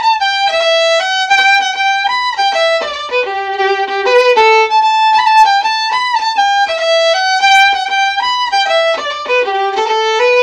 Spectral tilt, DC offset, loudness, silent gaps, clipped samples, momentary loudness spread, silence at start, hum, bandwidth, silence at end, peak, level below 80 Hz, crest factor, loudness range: 0.5 dB/octave; under 0.1%; -11 LUFS; none; under 0.1%; 6 LU; 0 s; none; 11.5 kHz; 0 s; 0 dBFS; -54 dBFS; 12 dB; 2 LU